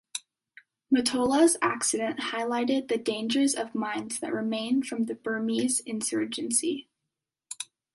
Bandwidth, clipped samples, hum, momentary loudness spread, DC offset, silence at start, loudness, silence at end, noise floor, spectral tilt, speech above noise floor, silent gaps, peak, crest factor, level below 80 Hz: 11.5 kHz; under 0.1%; none; 11 LU; under 0.1%; 0.15 s; -27 LUFS; 0.3 s; -86 dBFS; -2.5 dB/octave; 59 dB; none; -10 dBFS; 18 dB; -70 dBFS